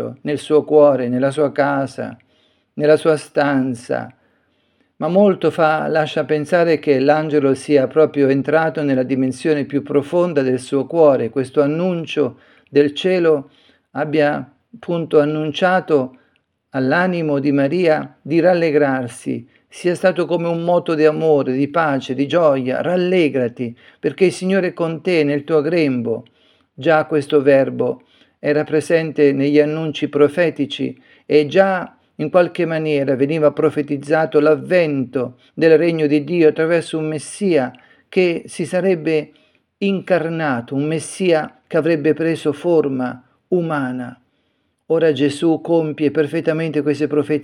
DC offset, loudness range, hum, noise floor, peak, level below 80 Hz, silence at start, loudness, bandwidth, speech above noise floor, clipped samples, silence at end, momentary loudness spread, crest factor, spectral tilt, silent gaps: under 0.1%; 4 LU; none; -66 dBFS; 0 dBFS; -68 dBFS; 0 s; -17 LUFS; 11.5 kHz; 50 dB; under 0.1%; 0 s; 10 LU; 16 dB; -6.5 dB/octave; none